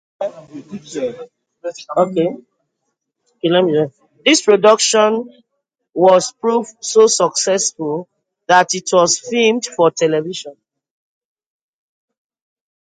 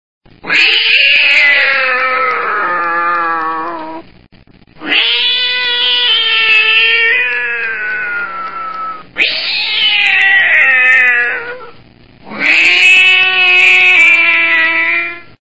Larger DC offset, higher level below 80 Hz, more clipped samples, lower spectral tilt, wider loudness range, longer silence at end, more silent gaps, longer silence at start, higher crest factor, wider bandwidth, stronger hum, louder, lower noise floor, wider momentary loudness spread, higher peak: second, under 0.1% vs 2%; second, -68 dBFS vs -54 dBFS; second, under 0.1% vs 0.2%; first, -3 dB/octave vs -0.5 dB/octave; about the same, 7 LU vs 7 LU; first, 2.35 s vs 0.05 s; neither; about the same, 0.2 s vs 0.2 s; about the same, 16 dB vs 12 dB; second, 9.6 kHz vs 11 kHz; neither; second, -15 LUFS vs -8 LUFS; first, -74 dBFS vs -43 dBFS; about the same, 18 LU vs 16 LU; about the same, 0 dBFS vs 0 dBFS